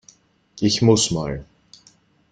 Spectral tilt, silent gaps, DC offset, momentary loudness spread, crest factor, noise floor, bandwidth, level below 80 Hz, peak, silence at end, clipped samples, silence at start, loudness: -4.5 dB/octave; none; under 0.1%; 14 LU; 20 dB; -56 dBFS; 9.6 kHz; -48 dBFS; -2 dBFS; 0.9 s; under 0.1%; 0.55 s; -19 LUFS